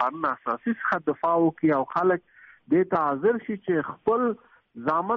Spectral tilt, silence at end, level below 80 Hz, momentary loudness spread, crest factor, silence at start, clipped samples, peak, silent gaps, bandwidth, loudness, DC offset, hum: -6.5 dB/octave; 0 s; -66 dBFS; 6 LU; 14 dB; 0 s; under 0.1%; -10 dBFS; none; 6 kHz; -25 LUFS; under 0.1%; none